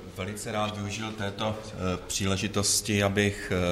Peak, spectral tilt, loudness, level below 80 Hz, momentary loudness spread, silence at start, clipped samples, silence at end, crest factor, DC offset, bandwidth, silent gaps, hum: -12 dBFS; -3.5 dB/octave; -28 LUFS; -50 dBFS; 9 LU; 0 s; under 0.1%; 0 s; 18 dB; under 0.1%; 15.5 kHz; none; none